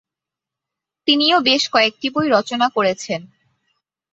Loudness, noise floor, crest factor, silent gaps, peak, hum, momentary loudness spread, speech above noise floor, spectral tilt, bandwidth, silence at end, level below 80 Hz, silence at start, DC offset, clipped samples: -17 LUFS; -86 dBFS; 18 dB; none; -2 dBFS; none; 11 LU; 69 dB; -3 dB/octave; 8.2 kHz; 0.85 s; -66 dBFS; 1.05 s; under 0.1%; under 0.1%